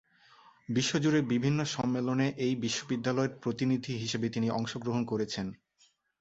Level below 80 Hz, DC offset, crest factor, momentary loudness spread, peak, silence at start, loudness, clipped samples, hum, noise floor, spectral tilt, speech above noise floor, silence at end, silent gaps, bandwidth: -66 dBFS; under 0.1%; 16 dB; 6 LU; -14 dBFS; 0.7 s; -31 LUFS; under 0.1%; none; -69 dBFS; -5.5 dB/octave; 38 dB; 0.65 s; none; 8.2 kHz